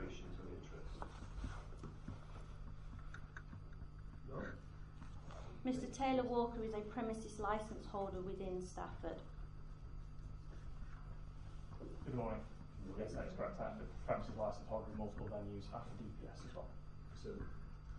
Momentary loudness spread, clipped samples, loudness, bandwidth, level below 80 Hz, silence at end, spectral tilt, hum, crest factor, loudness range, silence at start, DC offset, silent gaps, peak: 13 LU; under 0.1%; -48 LUFS; 11 kHz; -54 dBFS; 0 s; -6.5 dB/octave; none; 20 dB; 11 LU; 0 s; under 0.1%; none; -26 dBFS